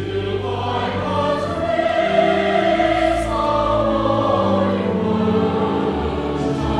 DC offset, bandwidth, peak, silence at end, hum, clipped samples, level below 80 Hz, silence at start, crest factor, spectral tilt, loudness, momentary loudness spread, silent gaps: under 0.1%; 11.5 kHz; -4 dBFS; 0 s; none; under 0.1%; -36 dBFS; 0 s; 16 dB; -7 dB/octave; -19 LUFS; 6 LU; none